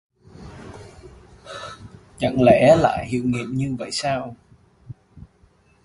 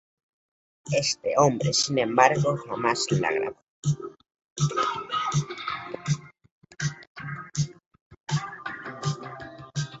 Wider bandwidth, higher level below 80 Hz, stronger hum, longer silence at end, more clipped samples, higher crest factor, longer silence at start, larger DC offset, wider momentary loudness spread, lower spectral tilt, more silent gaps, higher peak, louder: first, 11.5 kHz vs 8.2 kHz; first, -48 dBFS vs -60 dBFS; neither; first, 0.65 s vs 0 s; neither; about the same, 22 dB vs 26 dB; second, 0.4 s vs 0.85 s; neither; first, 27 LU vs 15 LU; first, -6 dB/octave vs -4.5 dB/octave; second, none vs 3.70-3.83 s, 4.44-4.56 s, 6.51-6.62 s, 7.07-7.15 s, 7.86-7.91 s, 8.01-8.10 s, 8.20-8.24 s; about the same, 0 dBFS vs -2 dBFS; first, -19 LUFS vs -27 LUFS